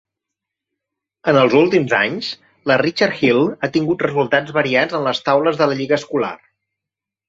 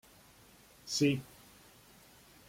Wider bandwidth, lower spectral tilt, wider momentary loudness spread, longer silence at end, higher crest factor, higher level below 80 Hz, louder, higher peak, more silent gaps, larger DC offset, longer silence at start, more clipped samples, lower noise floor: second, 7.8 kHz vs 16.5 kHz; first, -6 dB/octave vs -4.5 dB/octave; second, 8 LU vs 27 LU; second, 0.95 s vs 1.25 s; about the same, 16 dB vs 20 dB; first, -60 dBFS vs -70 dBFS; first, -17 LUFS vs -33 LUFS; first, 0 dBFS vs -18 dBFS; neither; neither; first, 1.25 s vs 0.85 s; neither; first, -85 dBFS vs -61 dBFS